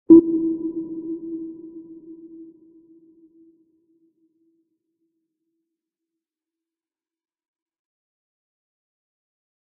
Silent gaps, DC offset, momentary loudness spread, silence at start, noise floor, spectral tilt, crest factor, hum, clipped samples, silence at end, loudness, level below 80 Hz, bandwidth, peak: none; under 0.1%; 28 LU; 0.1 s; under -90 dBFS; -4.5 dB/octave; 24 dB; none; under 0.1%; 7.2 s; -21 LUFS; -64 dBFS; 1.2 kHz; -2 dBFS